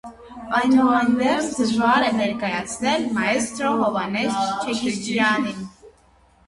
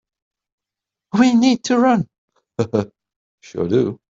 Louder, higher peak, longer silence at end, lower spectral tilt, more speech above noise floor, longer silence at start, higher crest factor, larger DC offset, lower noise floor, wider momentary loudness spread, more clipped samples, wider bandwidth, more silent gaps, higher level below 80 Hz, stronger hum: second, -21 LUFS vs -18 LUFS; about the same, -4 dBFS vs -4 dBFS; first, 0.6 s vs 0.15 s; second, -4 dB/octave vs -6 dB/octave; second, 35 dB vs 70 dB; second, 0.05 s vs 1.15 s; about the same, 18 dB vs 16 dB; neither; second, -56 dBFS vs -86 dBFS; second, 8 LU vs 18 LU; neither; first, 11.5 kHz vs 7.8 kHz; second, none vs 2.18-2.28 s, 3.16-3.38 s; about the same, -56 dBFS vs -58 dBFS; neither